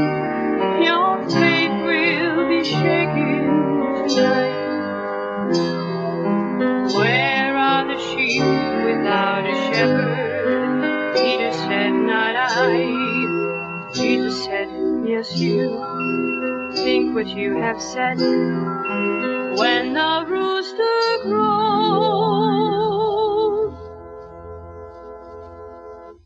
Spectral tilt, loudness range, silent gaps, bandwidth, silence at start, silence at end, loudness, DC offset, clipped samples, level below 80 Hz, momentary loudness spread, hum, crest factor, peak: -5.5 dB/octave; 3 LU; none; 7.8 kHz; 0 s; 0.15 s; -19 LUFS; under 0.1%; under 0.1%; -54 dBFS; 8 LU; none; 16 dB; -4 dBFS